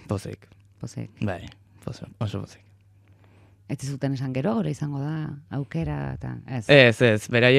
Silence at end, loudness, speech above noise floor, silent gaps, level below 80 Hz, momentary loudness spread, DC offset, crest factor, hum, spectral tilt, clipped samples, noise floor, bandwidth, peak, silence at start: 0 s; -24 LUFS; 32 dB; none; -54 dBFS; 22 LU; under 0.1%; 24 dB; none; -6 dB/octave; under 0.1%; -55 dBFS; 14 kHz; -2 dBFS; 0.1 s